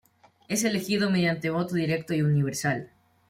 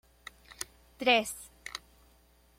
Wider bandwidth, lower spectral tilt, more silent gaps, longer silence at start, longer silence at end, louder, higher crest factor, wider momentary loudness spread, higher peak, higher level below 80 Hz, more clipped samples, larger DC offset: about the same, 16.5 kHz vs 16.5 kHz; first, -5 dB/octave vs -1.5 dB/octave; neither; about the same, 0.5 s vs 0.5 s; second, 0.45 s vs 0.8 s; first, -26 LUFS vs -31 LUFS; second, 16 dB vs 24 dB; second, 5 LU vs 24 LU; about the same, -12 dBFS vs -12 dBFS; about the same, -64 dBFS vs -64 dBFS; neither; neither